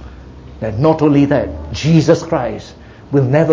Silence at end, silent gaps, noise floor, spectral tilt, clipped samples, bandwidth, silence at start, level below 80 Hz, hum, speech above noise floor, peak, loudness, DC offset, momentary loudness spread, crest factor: 0 s; none; -34 dBFS; -7.5 dB/octave; under 0.1%; 7.6 kHz; 0 s; -36 dBFS; none; 21 dB; 0 dBFS; -14 LUFS; under 0.1%; 12 LU; 14 dB